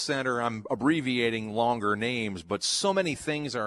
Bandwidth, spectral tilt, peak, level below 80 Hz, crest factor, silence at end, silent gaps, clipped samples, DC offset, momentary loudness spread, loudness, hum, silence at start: 12.5 kHz; -4 dB/octave; -12 dBFS; -62 dBFS; 16 dB; 0 s; none; under 0.1%; under 0.1%; 5 LU; -28 LUFS; none; 0 s